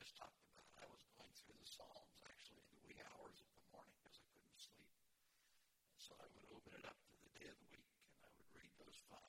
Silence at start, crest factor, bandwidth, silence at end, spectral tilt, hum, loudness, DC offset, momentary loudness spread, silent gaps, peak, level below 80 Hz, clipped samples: 0 s; 24 dB; 16.5 kHz; 0 s; -2.5 dB/octave; none; -64 LUFS; under 0.1%; 8 LU; none; -42 dBFS; -86 dBFS; under 0.1%